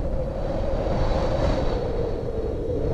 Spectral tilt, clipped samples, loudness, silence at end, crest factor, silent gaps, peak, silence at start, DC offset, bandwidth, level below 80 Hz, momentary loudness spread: -8 dB/octave; under 0.1%; -26 LUFS; 0 s; 12 dB; none; -12 dBFS; 0 s; under 0.1%; 8 kHz; -28 dBFS; 5 LU